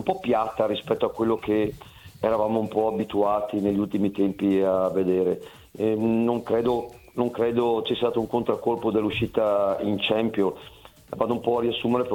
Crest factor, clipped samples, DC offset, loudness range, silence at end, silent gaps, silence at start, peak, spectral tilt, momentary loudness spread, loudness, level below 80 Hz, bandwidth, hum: 16 dB; under 0.1%; under 0.1%; 1 LU; 0 s; none; 0 s; -8 dBFS; -7 dB/octave; 6 LU; -25 LUFS; -54 dBFS; 18 kHz; none